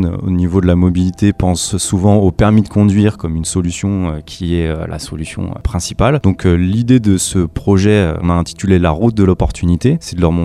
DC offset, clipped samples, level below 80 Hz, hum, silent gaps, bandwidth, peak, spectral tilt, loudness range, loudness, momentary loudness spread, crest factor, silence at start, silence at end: under 0.1%; under 0.1%; -28 dBFS; none; none; 13.5 kHz; 0 dBFS; -6.5 dB/octave; 4 LU; -14 LUFS; 8 LU; 12 dB; 0 s; 0 s